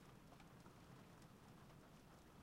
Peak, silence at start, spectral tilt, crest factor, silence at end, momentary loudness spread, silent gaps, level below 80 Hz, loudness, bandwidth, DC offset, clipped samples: -48 dBFS; 0 s; -5.5 dB/octave; 16 dB; 0 s; 2 LU; none; -74 dBFS; -64 LUFS; 16 kHz; under 0.1%; under 0.1%